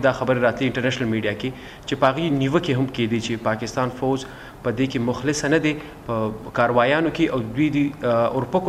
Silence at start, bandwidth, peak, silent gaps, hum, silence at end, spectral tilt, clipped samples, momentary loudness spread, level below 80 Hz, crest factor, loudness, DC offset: 0 s; 15 kHz; -4 dBFS; none; none; 0 s; -6 dB/octave; under 0.1%; 8 LU; -48 dBFS; 18 dB; -22 LUFS; under 0.1%